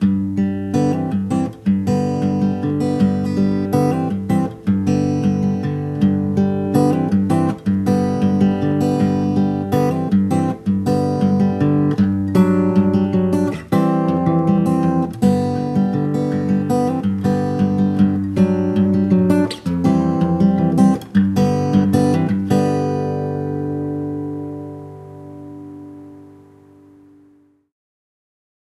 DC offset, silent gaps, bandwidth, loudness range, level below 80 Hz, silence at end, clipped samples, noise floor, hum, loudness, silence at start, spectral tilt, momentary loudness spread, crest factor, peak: under 0.1%; none; 12.5 kHz; 5 LU; -48 dBFS; 2.35 s; under 0.1%; -53 dBFS; none; -17 LUFS; 0 s; -8.5 dB/octave; 7 LU; 16 dB; 0 dBFS